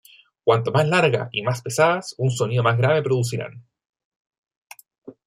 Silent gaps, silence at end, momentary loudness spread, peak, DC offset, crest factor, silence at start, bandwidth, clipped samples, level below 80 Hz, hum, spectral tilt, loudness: 3.89-3.93 s, 4.05-4.25 s, 4.38-4.43 s, 4.57-4.62 s, 4.98-5.02 s; 0.15 s; 7 LU; -4 dBFS; under 0.1%; 18 dB; 0.45 s; 15 kHz; under 0.1%; -62 dBFS; none; -5.5 dB/octave; -21 LUFS